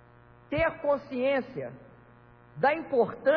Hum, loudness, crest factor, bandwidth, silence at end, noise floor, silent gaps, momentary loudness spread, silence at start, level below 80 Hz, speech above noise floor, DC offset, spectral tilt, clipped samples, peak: 60 Hz at -55 dBFS; -29 LUFS; 18 dB; 5.4 kHz; 0 s; -55 dBFS; none; 13 LU; 0.5 s; -56 dBFS; 28 dB; under 0.1%; -8.5 dB/octave; under 0.1%; -12 dBFS